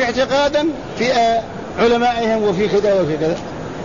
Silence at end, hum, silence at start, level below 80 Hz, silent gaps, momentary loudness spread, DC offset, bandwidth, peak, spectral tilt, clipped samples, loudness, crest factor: 0 s; none; 0 s; -44 dBFS; none; 7 LU; 0.6%; 7.4 kHz; -4 dBFS; -5 dB/octave; under 0.1%; -17 LUFS; 12 dB